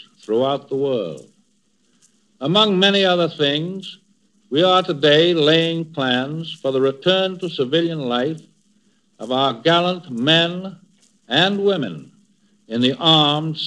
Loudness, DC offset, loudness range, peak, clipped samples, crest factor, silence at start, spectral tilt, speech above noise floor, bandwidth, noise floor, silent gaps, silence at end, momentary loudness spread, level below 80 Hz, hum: -18 LUFS; under 0.1%; 4 LU; 0 dBFS; under 0.1%; 18 dB; 0.3 s; -5.5 dB/octave; 46 dB; 10.5 kHz; -64 dBFS; none; 0 s; 14 LU; -78 dBFS; none